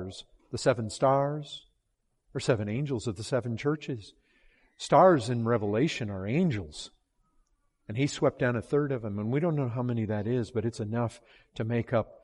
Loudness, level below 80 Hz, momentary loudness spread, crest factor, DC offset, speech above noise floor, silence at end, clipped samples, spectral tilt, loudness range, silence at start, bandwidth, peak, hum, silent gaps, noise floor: -29 LUFS; -62 dBFS; 15 LU; 20 dB; under 0.1%; 48 dB; 0.1 s; under 0.1%; -6.5 dB/octave; 4 LU; 0 s; 11.5 kHz; -8 dBFS; none; none; -77 dBFS